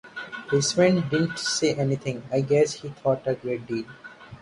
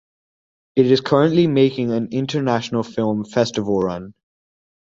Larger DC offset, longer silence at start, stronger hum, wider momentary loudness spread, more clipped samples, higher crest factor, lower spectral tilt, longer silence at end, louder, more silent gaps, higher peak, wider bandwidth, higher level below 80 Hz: neither; second, 0.05 s vs 0.75 s; neither; first, 15 LU vs 8 LU; neither; about the same, 18 dB vs 18 dB; second, -5 dB/octave vs -6.5 dB/octave; second, 0.05 s vs 0.8 s; second, -24 LUFS vs -19 LUFS; neither; second, -6 dBFS vs -2 dBFS; first, 11.5 kHz vs 7.8 kHz; second, -60 dBFS vs -54 dBFS